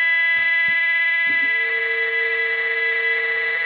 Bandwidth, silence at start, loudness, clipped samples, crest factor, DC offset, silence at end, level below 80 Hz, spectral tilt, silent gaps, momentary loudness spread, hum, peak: 5.2 kHz; 0 s; -17 LUFS; under 0.1%; 10 dB; under 0.1%; 0 s; -62 dBFS; -2.5 dB/octave; none; 3 LU; none; -10 dBFS